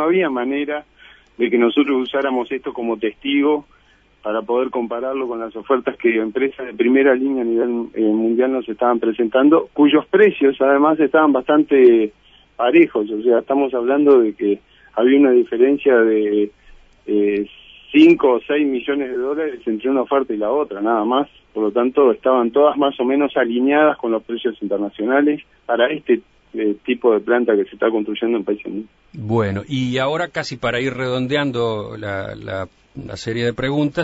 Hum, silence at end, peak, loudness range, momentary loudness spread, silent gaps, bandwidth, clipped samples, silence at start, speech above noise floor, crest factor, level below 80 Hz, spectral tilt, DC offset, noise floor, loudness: none; 0 s; -2 dBFS; 7 LU; 12 LU; none; 8 kHz; under 0.1%; 0 s; 35 dB; 16 dB; -56 dBFS; -7 dB/octave; under 0.1%; -52 dBFS; -18 LUFS